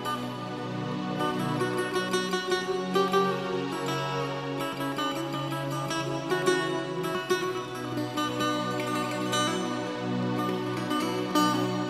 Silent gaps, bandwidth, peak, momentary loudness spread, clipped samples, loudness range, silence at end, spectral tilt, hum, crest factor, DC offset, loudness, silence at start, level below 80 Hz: none; 15 kHz; -12 dBFS; 6 LU; under 0.1%; 2 LU; 0 s; -4.5 dB/octave; none; 18 dB; under 0.1%; -29 LUFS; 0 s; -66 dBFS